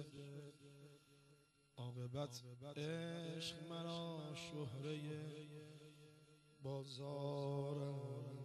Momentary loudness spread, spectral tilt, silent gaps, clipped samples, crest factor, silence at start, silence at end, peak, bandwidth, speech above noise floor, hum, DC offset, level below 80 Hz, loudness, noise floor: 19 LU; -6 dB/octave; none; under 0.1%; 16 dB; 0 s; 0 s; -34 dBFS; 12.5 kHz; 25 dB; none; under 0.1%; -82 dBFS; -49 LUFS; -73 dBFS